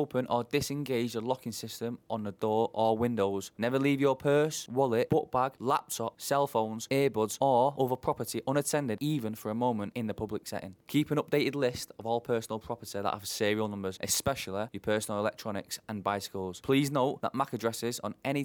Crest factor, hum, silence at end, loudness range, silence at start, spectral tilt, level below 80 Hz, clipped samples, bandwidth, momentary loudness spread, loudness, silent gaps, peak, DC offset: 16 dB; none; 0 s; 4 LU; 0 s; -5 dB/octave; -64 dBFS; under 0.1%; over 20 kHz; 10 LU; -31 LUFS; none; -14 dBFS; under 0.1%